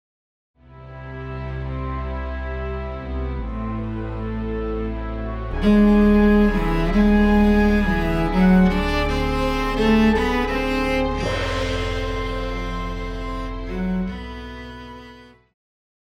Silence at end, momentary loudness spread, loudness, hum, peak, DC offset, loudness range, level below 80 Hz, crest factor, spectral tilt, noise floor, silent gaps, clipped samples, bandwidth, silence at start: 0.8 s; 15 LU; -21 LUFS; none; -6 dBFS; under 0.1%; 12 LU; -28 dBFS; 16 dB; -7 dB/octave; -45 dBFS; none; under 0.1%; 13.5 kHz; 0.7 s